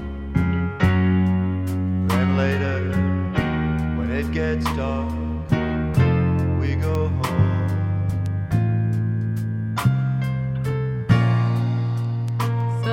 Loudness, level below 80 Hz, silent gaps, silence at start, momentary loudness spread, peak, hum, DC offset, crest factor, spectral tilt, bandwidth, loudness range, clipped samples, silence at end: -22 LUFS; -34 dBFS; none; 0 s; 5 LU; -4 dBFS; none; under 0.1%; 16 dB; -8 dB/octave; 15.5 kHz; 2 LU; under 0.1%; 0 s